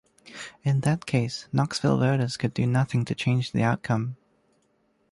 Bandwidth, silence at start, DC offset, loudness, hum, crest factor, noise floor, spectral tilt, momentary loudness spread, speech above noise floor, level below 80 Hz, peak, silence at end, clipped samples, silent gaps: 11.5 kHz; 0.25 s; under 0.1%; -26 LUFS; none; 16 dB; -68 dBFS; -6.5 dB/octave; 12 LU; 44 dB; -58 dBFS; -10 dBFS; 0.95 s; under 0.1%; none